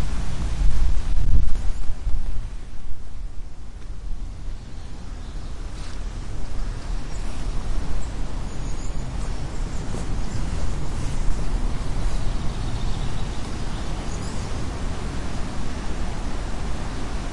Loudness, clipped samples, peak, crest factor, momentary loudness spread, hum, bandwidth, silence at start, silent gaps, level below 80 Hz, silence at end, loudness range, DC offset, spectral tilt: -31 LUFS; under 0.1%; -2 dBFS; 16 dB; 11 LU; none; 11 kHz; 0 s; none; -26 dBFS; 0 s; 7 LU; under 0.1%; -5.5 dB/octave